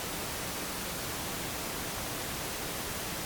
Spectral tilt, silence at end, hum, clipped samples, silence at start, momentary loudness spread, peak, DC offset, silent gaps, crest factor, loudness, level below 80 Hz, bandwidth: -2.5 dB/octave; 0 s; none; under 0.1%; 0 s; 0 LU; -22 dBFS; under 0.1%; none; 14 dB; -35 LUFS; -50 dBFS; over 20 kHz